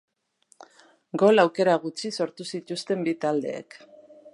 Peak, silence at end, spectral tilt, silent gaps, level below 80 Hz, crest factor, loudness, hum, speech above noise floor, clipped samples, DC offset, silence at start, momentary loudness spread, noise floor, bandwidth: -6 dBFS; 0.05 s; -5 dB/octave; none; -80 dBFS; 20 dB; -25 LUFS; none; 40 dB; under 0.1%; under 0.1%; 1.15 s; 16 LU; -64 dBFS; 11.5 kHz